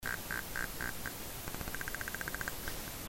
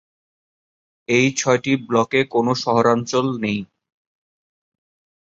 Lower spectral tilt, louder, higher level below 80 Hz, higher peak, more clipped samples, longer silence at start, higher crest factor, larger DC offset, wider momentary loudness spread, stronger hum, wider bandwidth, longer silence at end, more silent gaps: second, -2.5 dB/octave vs -4.5 dB/octave; second, -40 LUFS vs -19 LUFS; first, -50 dBFS vs -60 dBFS; second, -16 dBFS vs -2 dBFS; neither; second, 0 s vs 1.1 s; first, 24 dB vs 18 dB; neither; second, 4 LU vs 7 LU; neither; first, 16.5 kHz vs 8 kHz; second, 0 s vs 1.6 s; neither